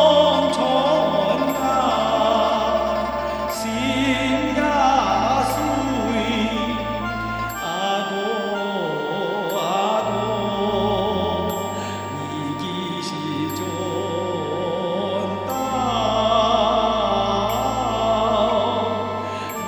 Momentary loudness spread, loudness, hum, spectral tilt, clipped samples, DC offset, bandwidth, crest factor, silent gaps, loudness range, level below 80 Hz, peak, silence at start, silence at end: 8 LU; -21 LUFS; 50 Hz at -55 dBFS; -5 dB/octave; under 0.1%; under 0.1%; over 20 kHz; 18 dB; none; 5 LU; -42 dBFS; -4 dBFS; 0 s; 0 s